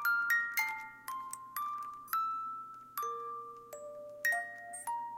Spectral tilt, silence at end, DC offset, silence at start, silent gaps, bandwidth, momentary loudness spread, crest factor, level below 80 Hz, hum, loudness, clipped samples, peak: 0 dB/octave; 0 s; under 0.1%; 0 s; none; 17 kHz; 16 LU; 20 dB; -82 dBFS; none; -36 LUFS; under 0.1%; -18 dBFS